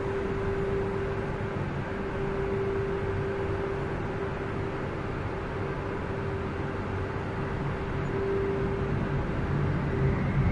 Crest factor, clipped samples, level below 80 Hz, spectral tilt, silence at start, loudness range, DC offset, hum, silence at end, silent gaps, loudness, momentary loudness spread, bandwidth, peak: 16 dB; under 0.1%; -40 dBFS; -8.5 dB/octave; 0 s; 3 LU; under 0.1%; none; 0 s; none; -31 LUFS; 4 LU; 10 kHz; -14 dBFS